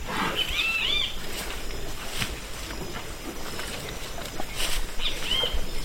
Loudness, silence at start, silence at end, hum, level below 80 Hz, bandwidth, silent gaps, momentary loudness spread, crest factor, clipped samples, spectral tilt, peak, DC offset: -29 LUFS; 0 s; 0 s; none; -34 dBFS; 16.5 kHz; none; 12 LU; 20 dB; under 0.1%; -2 dB/octave; -8 dBFS; under 0.1%